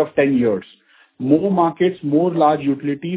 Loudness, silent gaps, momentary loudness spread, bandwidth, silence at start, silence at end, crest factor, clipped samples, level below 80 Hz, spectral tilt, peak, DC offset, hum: -18 LUFS; none; 7 LU; 4 kHz; 0 s; 0 s; 16 dB; under 0.1%; -58 dBFS; -11.5 dB/octave; 0 dBFS; under 0.1%; none